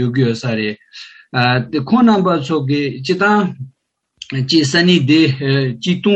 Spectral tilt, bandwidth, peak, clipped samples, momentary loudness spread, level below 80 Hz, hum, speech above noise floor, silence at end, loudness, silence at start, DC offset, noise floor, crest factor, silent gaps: -6 dB/octave; 8.8 kHz; 0 dBFS; under 0.1%; 13 LU; -58 dBFS; none; 33 dB; 0 s; -15 LUFS; 0 s; under 0.1%; -47 dBFS; 14 dB; none